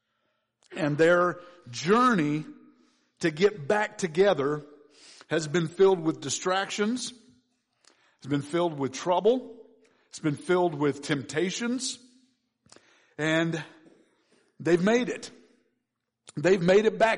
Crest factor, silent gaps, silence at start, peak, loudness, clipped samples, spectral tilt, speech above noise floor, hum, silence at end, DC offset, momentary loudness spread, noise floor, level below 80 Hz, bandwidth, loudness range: 16 dB; none; 0.7 s; -10 dBFS; -26 LUFS; under 0.1%; -5 dB/octave; 56 dB; none; 0 s; under 0.1%; 15 LU; -82 dBFS; -68 dBFS; 10.5 kHz; 5 LU